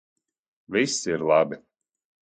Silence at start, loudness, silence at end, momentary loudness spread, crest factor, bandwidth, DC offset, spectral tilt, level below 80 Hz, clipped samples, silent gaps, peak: 0.7 s; -24 LUFS; 0.65 s; 7 LU; 18 dB; 9.4 kHz; under 0.1%; -3.5 dB/octave; -66 dBFS; under 0.1%; none; -8 dBFS